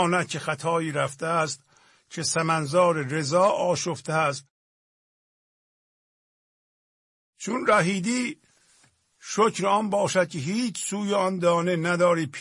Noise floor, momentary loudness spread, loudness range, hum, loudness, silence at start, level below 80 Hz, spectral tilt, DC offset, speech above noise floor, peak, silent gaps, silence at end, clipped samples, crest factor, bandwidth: -62 dBFS; 8 LU; 7 LU; none; -24 LUFS; 0 s; -70 dBFS; -4.5 dB/octave; under 0.1%; 38 dB; -8 dBFS; 4.50-7.33 s; 0 s; under 0.1%; 18 dB; 11.5 kHz